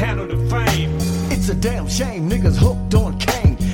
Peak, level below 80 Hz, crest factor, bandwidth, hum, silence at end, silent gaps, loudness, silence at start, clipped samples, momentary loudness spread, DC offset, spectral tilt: -2 dBFS; -24 dBFS; 16 dB; 17 kHz; none; 0 s; none; -19 LUFS; 0 s; under 0.1%; 5 LU; under 0.1%; -5.5 dB/octave